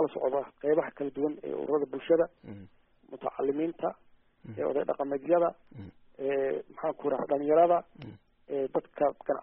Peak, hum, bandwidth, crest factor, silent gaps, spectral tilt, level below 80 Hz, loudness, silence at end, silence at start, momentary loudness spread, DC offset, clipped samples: -12 dBFS; none; 3.8 kHz; 18 dB; none; -6 dB/octave; -68 dBFS; -30 LUFS; 0 s; 0 s; 22 LU; under 0.1%; under 0.1%